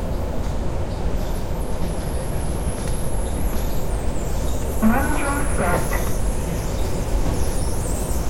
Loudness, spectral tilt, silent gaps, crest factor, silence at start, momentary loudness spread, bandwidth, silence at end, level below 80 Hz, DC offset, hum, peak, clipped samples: -25 LUFS; -5.5 dB/octave; none; 16 dB; 0 s; 6 LU; 16.5 kHz; 0 s; -24 dBFS; under 0.1%; none; -4 dBFS; under 0.1%